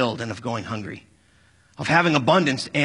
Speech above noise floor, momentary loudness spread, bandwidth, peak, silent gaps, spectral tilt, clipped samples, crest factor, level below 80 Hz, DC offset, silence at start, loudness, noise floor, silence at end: 36 dB; 15 LU; 11 kHz; -2 dBFS; none; -5 dB/octave; under 0.1%; 22 dB; -60 dBFS; under 0.1%; 0 s; -22 LUFS; -58 dBFS; 0 s